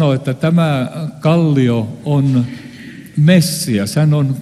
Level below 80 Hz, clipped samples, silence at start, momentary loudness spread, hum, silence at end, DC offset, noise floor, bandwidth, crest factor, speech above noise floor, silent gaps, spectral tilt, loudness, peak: -52 dBFS; under 0.1%; 0 s; 13 LU; none; 0 s; under 0.1%; -33 dBFS; 13 kHz; 14 dB; 20 dB; none; -6.5 dB/octave; -15 LUFS; 0 dBFS